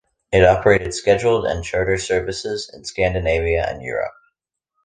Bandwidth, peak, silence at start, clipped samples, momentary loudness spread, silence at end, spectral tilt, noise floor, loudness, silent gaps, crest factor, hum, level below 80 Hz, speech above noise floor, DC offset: 9.8 kHz; -2 dBFS; 0.3 s; under 0.1%; 12 LU; 0.75 s; -5 dB/octave; -77 dBFS; -19 LUFS; none; 18 dB; none; -36 dBFS; 58 dB; under 0.1%